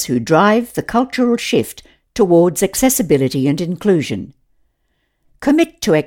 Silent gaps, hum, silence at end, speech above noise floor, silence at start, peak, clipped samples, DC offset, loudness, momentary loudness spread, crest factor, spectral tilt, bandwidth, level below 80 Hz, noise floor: none; none; 0 s; 52 dB; 0 s; 0 dBFS; under 0.1%; under 0.1%; -15 LUFS; 11 LU; 14 dB; -5 dB/octave; 18 kHz; -46 dBFS; -66 dBFS